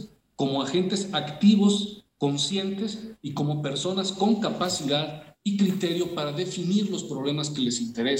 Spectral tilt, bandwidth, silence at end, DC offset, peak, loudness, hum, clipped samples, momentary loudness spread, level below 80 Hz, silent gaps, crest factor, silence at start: -5 dB/octave; 16 kHz; 0 s; under 0.1%; -8 dBFS; -26 LUFS; none; under 0.1%; 9 LU; -66 dBFS; none; 18 dB; 0 s